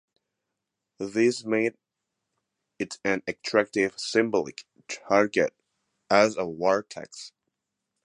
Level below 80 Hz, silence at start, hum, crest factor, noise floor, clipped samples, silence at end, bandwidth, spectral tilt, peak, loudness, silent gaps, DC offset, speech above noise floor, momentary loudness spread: -68 dBFS; 1 s; none; 24 dB; -84 dBFS; under 0.1%; 0.75 s; 11 kHz; -4 dB/octave; -4 dBFS; -26 LUFS; none; under 0.1%; 59 dB; 17 LU